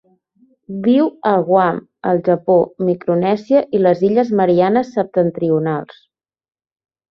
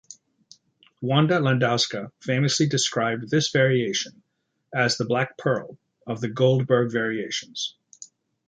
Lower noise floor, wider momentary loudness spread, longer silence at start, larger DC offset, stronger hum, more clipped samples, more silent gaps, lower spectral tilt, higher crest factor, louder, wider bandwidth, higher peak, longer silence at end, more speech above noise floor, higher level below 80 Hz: second, -56 dBFS vs -60 dBFS; second, 6 LU vs 11 LU; first, 0.7 s vs 0.1 s; neither; neither; neither; neither; first, -9 dB/octave vs -4.5 dB/octave; about the same, 14 dB vs 18 dB; first, -16 LUFS vs -23 LUFS; second, 6.4 kHz vs 9.4 kHz; first, -2 dBFS vs -6 dBFS; first, 1.25 s vs 0.45 s; first, 41 dB vs 37 dB; first, -60 dBFS vs -66 dBFS